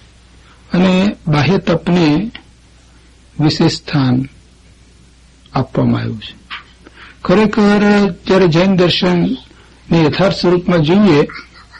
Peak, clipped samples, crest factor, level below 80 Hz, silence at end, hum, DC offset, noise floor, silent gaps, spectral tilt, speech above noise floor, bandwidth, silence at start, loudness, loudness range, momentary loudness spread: -2 dBFS; under 0.1%; 12 dB; -40 dBFS; 0.35 s; none; under 0.1%; -45 dBFS; none; -7 dB/octave; 32 dB; 8.8 kHz; 0.7 s; -13 LUFS; 7 LU; 15 LU